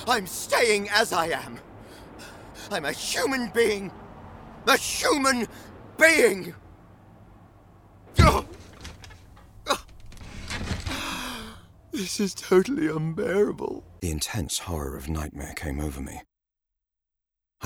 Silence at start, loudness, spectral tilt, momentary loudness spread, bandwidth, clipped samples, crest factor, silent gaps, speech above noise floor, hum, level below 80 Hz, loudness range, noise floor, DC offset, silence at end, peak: 0 s; -25 LUFS; -4 dB/octave; 23 LU; 19 kHz; under 0.1%; 24 dB; none; 62 dB; none; -40 dBFS; 9 LU; -86 dBFS; under 0.1%; 0 s; -4 dBFS